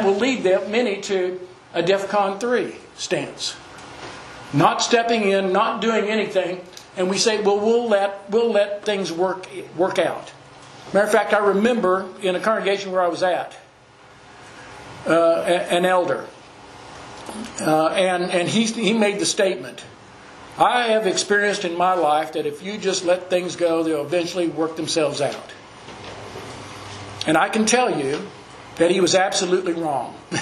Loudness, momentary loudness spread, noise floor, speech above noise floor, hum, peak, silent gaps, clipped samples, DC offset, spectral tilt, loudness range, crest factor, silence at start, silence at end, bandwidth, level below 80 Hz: -20 LUFS; 18 LU; -48 dBFS; 28 dB; none; 0 dBFS; none; under 0.1%; under 0.1%; -3.5 dB/octave; 3 LU; 20 dB; 0 s; 0 s; 13 kHz; -62 dBFS